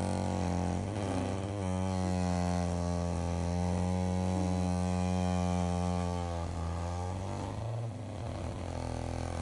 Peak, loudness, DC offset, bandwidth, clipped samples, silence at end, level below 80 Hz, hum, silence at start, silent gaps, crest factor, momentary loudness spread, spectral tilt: -18 dBFS; -34 LUFS; under 0.1%; 11.5 kHz; under 0.1%; 0 s; -52 dBFS; none; 0 s; none; 14 dB; 6 LU; -6.5 dB/octave